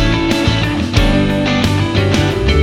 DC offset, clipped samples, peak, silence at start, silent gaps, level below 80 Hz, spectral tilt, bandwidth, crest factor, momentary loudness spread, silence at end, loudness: under 0.1%; under 0.1%; -2 dBFS; 0 s; none; -22 dBFS; -6 dB/octave; 15.5 kHz; 12 dB; 1 LU; 0 s; -14 LUFS